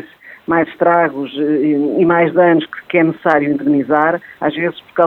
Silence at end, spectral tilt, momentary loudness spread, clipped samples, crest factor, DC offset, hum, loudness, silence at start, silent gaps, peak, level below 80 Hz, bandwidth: 0 s; -9 dB/octave; 7 LU; under 0.1%; 14 dB; under 0.1%; none; -15 LUFS; 0 s; none; 0 dBFS; -58 dBFS; 4.3 kHz